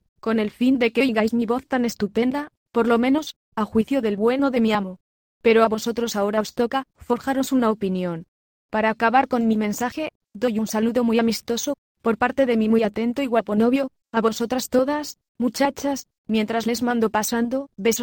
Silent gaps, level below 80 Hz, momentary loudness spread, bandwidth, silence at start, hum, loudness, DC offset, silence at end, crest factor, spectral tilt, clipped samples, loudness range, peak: 2.57-2.66 s, 3.36-3.52 s, 5.00-5.41 s, 8.28-8.69 s, 10.15-10.20 s, 11.78-11.95 s, 15.29-15.35 s, 16.18-16.24 s; -56 dBFS; 8 LU; 17.5 kHz; 0.25 s; none; -22 LUFS; under 0.1%; 0 s; 18 dB; -4.5 dB/octave; under 0.1%; 2 LU; -4 dBFS